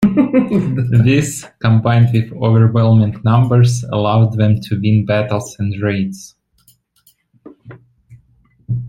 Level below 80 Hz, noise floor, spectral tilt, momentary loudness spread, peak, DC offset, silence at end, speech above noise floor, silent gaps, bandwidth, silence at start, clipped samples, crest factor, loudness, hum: -46 dBFS; -56 dBFS; -7.5 dB/octave; 9 LU; 0 dBFS; under 0.1%; 0 s; 43 dB; none; 12 kHz; 0 s; under 0.1%; 14 dB; -14 LUFS; none